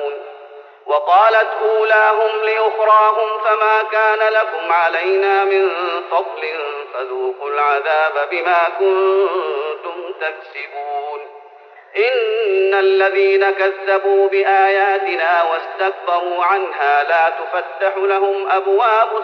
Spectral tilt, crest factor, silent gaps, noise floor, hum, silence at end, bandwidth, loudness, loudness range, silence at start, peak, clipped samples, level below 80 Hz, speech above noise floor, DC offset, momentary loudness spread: 3 dB/octave; 14 dB; none; -42 dBFS; none; 0 s; 6 kHz; -16 LUFS; 5 LU; 0 s; -2 dBFS; under 0.1%; -84 dBFS; 26 dB; under 0.1%; 12 LU